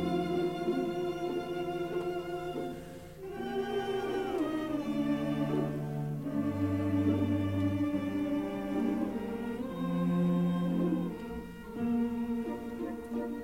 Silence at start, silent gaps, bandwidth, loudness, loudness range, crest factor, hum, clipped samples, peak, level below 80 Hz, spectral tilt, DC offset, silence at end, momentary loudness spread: 0 s; none; 16 kHz; -33 LUFS; 4 LU; 16 dB; none; under 0.1%; -18 dBFS; -58 dBFS; -8 dB/octave; 0.1%; 0 s; 8 LU